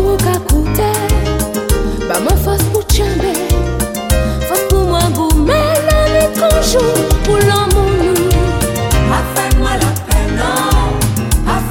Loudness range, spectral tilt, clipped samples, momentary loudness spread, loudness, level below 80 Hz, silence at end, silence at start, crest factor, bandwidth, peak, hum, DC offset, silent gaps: 3 LU; -5 dB/octave; under 0.1%; 4 LU; -13 LUFS; -16 dBFS; 0 s; 0 s; 12 dB; 17 kHz; 0 dBFS; none; under 0.1%; none